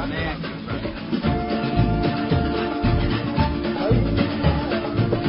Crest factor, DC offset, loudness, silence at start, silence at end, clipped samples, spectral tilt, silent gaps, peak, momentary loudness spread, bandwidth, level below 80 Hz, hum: 16 dB; under 0.1%; -23 LUFS; 0 s; 0 s; under 0.1%; -12 dB/octave; none; -6 dBFS; 7 LU; 5.6 kHz; -30 dBFS; none